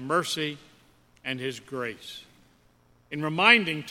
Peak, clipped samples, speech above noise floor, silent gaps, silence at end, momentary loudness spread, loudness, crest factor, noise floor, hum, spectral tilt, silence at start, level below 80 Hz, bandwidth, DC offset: -2 dBFS; under 0.1%; 35 dB; none; 0 s; 23 LU; -25 LUFS; 26 dB; -62 dBFS; none; -3.5 dB/octave; 0 s; -68 dBFS; 16.5 kHz; under 0.1%